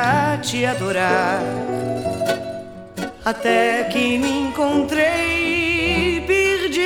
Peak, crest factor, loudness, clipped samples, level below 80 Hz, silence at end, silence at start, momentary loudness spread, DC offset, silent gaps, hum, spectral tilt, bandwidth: -2 dBFS; 18 dB; -19 LUFS; under 0.1%; -42 dBFS; 0 s; 0 s; 8 LU; under 0.1%; none; none; -4.5 dB/octave; 19.5 kHz